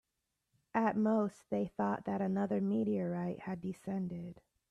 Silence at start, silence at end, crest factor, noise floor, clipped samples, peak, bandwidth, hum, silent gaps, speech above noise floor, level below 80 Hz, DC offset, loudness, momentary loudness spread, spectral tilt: 0.75 s; 0.3 s; 16 dB; -86 dBFS; under 0.1%; -20 dBFS; 10.5 kHz; none; none; 51 dB; -74 dBFS; under 0.1%; -36 LUFS; 10 LU; -9 dB/octave